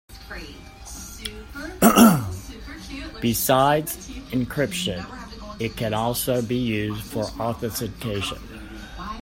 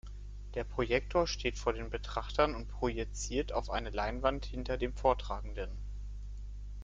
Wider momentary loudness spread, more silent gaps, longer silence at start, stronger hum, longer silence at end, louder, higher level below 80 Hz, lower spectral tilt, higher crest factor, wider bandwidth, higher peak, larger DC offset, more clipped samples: first, 20 LU vs 15 LU; neither; about the same, 0.1 s vs 0.05 s; second, none vs 50 Hz at -40 dBFS; about the same, 0.05 s vs 0 s; first, -22 LUFS vs -35 LUFS; about the same, -42 dBFS vs -42 dBFS; about the same, -4.5 dB/octave vs -5 dB/octave; about the same, 24 dB vs 22 dB; first, 16.5 kHz vs 9 kHz; first, 0 dBFS vs -14 dBFS; neither; neither